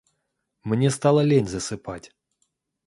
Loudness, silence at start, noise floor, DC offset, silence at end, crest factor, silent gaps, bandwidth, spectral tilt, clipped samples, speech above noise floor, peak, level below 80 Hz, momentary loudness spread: -22 LUFS; 0.65 s; -77 dBFS; under 0.1%; 0.8 s; 20 dB; none; 11.5 kHz; -6 dB/octave; under 0.1%; 55 dB; -6 dBFS; -54 dBFS; 19 LU